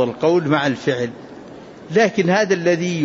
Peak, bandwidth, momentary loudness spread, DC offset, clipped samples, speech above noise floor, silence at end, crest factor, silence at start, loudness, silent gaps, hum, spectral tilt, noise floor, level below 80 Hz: -4 dBFS; 7.8 kHz; 21 LU; under 0.1%; under 0.1%; 20 dB; 0 s; 14 dB; 0 s; -18 LUFS; none; none; -5.5 dB/octave; -38 dBFS; -60 dBFS